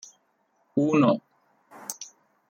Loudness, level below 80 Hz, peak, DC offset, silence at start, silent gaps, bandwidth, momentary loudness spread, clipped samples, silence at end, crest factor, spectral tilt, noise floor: -25 LUFS; -74 dBFS; -10 dBFS; under 0.1%; 0.75 s; none; 16.5 kHz; 19 LU; under 0.1%; 0.45 s; 18 dB; -6 dB/octave; -70 dBFS